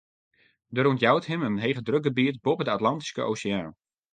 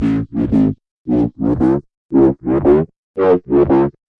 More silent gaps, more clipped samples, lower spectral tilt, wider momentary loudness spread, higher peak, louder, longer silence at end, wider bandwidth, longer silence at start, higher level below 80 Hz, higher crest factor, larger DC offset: second, none vs 0.91-1.05 s, 1.97-2.09 s, 2.96-3.14 s; neither; second, -6 dB/octave vs -10.5 dB/octave; about the same, 8 LU vs 6 LU; second, -6 dBFS vs 0 dBFS; second, -26 LUFS vs -15 LUFS; about the same, 0.4 s vs 0.3 s; first, 9.4 kHz vs 4.8 kHz; first, 0.7 s vs 0 s; second, -64 dBFS vs -36 dBFS; first, 20 dB vs 14 dB; neither